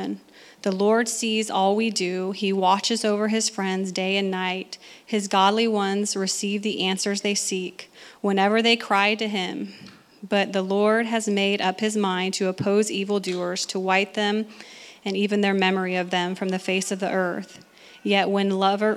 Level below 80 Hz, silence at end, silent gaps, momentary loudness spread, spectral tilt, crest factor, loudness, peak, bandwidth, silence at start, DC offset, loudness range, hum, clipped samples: -78 dBFS; 0 s; none; 10 LU; -4 dB/octave; 18 dB; -23 LUFS; -6 dBFS; 14.5 kHz; 0 s; under 0.1%; 2 LU; none; under 0.1%